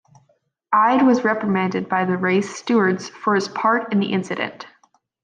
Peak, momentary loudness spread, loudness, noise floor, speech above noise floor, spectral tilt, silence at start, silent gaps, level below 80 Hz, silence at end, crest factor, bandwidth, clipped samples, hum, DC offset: -6 dBFS; 8 LU; -20 LUFS; -64 dBFS; 45 dB; -6 dB/octave; 0.7 s; none; -66 dBFS; 0.55 s; 16 dB; 9.4 kHz; under 0.1%; none; under 0.1%